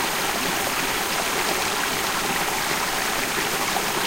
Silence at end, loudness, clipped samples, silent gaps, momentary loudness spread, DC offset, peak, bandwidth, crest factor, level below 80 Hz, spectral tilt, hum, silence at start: 0 s; -22 LUFS; under 0.1%; none; 1 LU; under 0.1%; -10 dBFS; 16 kHz; 14 dB; -46 dBFS; -1.5 dB/octave; none; 0 s